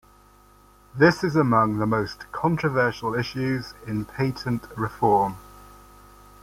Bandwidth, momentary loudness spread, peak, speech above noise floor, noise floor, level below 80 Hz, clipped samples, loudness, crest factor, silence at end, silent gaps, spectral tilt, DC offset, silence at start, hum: 16.5 kHz; 12 LU; -4 dBFS; 31 dB; -54 dBFS; -52 dBFS; under 0.1%; -24 LUFS; 20 dB; 0.85 s; none; -7 dB/octave; under 0.1%; 0.95 s; 50 Hz at -50 dBFS